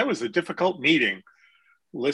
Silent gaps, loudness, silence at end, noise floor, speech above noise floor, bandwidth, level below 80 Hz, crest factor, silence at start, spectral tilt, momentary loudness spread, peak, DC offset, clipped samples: none; -23 LUFS; 0 s; -62 dBFS; 37 dB; 11.5 kHz; -72 dBFS; 18 dB; 0 s; -4.5 dB/octave; 14 LU; -8 dBFS; under 0.1%; under 0.1%